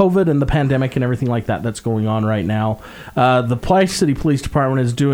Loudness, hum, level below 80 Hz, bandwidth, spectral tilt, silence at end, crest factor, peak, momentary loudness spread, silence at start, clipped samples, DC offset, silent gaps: -18 LUFS; none; -36 dBFS; 16.5 kHz; -6.5 dB/octave; 0 s; 16 dB; -2 dBFS; 6 LU; 0 s; under 0.1%; under 0.1%; none